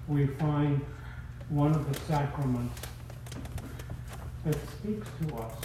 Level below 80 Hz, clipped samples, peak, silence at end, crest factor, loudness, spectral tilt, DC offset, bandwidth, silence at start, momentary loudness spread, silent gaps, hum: -46 dBFS; under 0.1%; -14 dBFS; 0 s; 18 dB; -33 LUFS; -7.5 dB/octave; under 0.1%; 15 kHz; 0 s; 14 LU; none; none